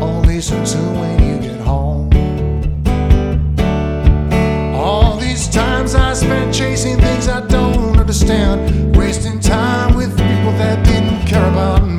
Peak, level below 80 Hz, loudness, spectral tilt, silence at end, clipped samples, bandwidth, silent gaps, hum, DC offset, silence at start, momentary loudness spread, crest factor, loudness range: 0 dBFS; -16 dBFS; -14 LUFS; -6 dB/octave; 0 s; under 0.1%; 13.5 kHz; none; none; under 0.1%; 0 s; 4 LU; 12 dB; 2 LU